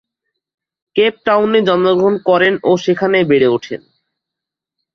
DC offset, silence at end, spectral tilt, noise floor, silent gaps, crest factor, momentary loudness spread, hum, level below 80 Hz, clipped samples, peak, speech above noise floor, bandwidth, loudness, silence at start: under 0.1%; 1.2 s; -6 dB/octave; -83 dBFS; none; 14 dB; 8 LU; none; -58 dBFS; under 0.1%; -2 dBFS; 71 dB; 6.8 kHz; -13 LUFS; 0.95 s